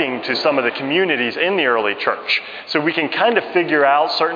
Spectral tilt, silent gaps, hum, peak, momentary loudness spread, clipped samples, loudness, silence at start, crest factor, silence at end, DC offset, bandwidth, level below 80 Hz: -5.5 dB/octave; none; none; -2 dBFS; 5 LU; under 0.1%; -17 LUFS; 0 s; 16 dB; 0 s; under 0.1%; 5.2 kHz; -70 dBFS